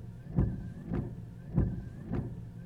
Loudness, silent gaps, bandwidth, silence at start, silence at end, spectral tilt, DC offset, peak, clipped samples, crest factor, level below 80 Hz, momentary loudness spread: -36 LUFS; none; 5.4 kHz; 0 s; 0 s; -10.5 dB/octave; under 0.1%; -16 dBFS; under 0.1%; 20 dB; -42 dBFS; 10 LU